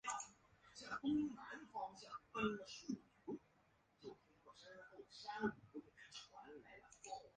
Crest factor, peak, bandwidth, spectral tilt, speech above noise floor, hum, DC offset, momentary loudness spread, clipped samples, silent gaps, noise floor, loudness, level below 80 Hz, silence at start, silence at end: 20 dB; -30 dBFS; 9.6 kHz; -4 dB/octave; 32 dB; none; under 0.1%; 17 LU; under 0.1%; none; -77 dBFS; -49 LUFS; -78 dBFS; 0.05 s; 0.05 s